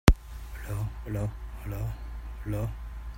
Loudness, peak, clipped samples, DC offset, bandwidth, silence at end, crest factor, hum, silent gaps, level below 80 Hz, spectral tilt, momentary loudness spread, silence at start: -34 LUFS; 0 dBFS; under 0.1%; under 0.1%; 16.5 kHz; 0 s; 30 dB; none; none; -32 dBFS; -6 dB/octave; 8 LU; 0.05 s